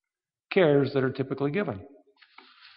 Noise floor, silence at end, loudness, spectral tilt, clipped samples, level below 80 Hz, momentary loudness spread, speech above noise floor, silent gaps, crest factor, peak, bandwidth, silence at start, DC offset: under -90 dBFS; 0.9 s; -26 LUFS; -6 dB/octave; under 0.1%; -70 dBFS; 10 LU; over 65 dB; none; 20 dB; -8 dBFS; 5.4 kHz; 0.5 s; under 0.1%